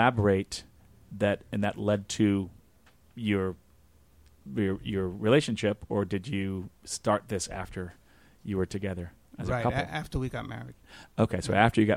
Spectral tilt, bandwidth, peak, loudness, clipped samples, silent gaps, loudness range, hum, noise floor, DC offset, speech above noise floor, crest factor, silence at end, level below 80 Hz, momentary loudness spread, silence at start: -6 dB/octave; 15.5 kHz; -6 dBFS; -30 LUFS; under 0.1%; none; 4 LU; none; -62 dBFS; under 0.1%; 33 dB; 24 dB; 0 s; -50 dBFS; 16 LU; 0 s